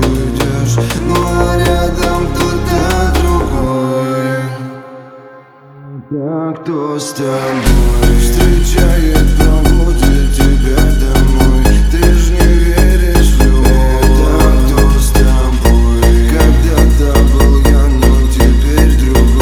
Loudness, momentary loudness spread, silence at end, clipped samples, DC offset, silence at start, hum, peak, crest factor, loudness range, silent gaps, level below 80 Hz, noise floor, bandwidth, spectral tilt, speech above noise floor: -11 LUFS; 8 LU; 0 s; under 0.1%; under 0.1%; 0 s; none; 0 dBFS; 8 dB; 8 LU; none; -10 dBFS; -37 dBFS; 16.5 kHz; -6 dB/octave; 27 dB